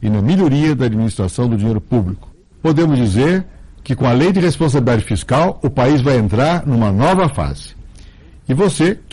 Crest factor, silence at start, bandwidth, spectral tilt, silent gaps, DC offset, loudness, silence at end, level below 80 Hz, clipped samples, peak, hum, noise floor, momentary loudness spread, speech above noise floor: 10 dB; 0 s; 11.5 kHz; -7 dB/octave; none; under 0.1%; -15 LUFS; 0.15 s; -36 dBFS; under 0.1%; -4 dBFS; none; -39 dBFS; 9 LU; 26 dB